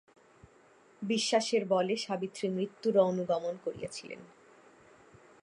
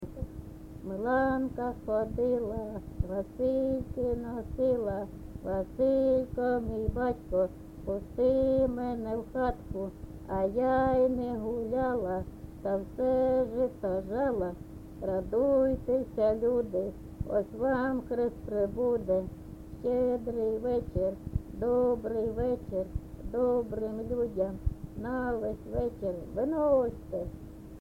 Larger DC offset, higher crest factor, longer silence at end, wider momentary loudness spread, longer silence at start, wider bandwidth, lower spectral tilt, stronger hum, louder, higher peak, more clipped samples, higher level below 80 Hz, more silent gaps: neither; first, 20 dB vs 14 dB; first, 1.15 s vs 0 s; first, 15 LU vs 12 LU; first, 1 s vs 0 s; second, 11.5 kHz vs 16 kHz; second, -4.5 dB/octave vs -9 dB/octave; neither; about the same, -31 LUFS vs -31 LUFS; about the same, -14 dBFS vs -16 dBFS; neither; second, -74 dBFS vs -46 dBFS; neither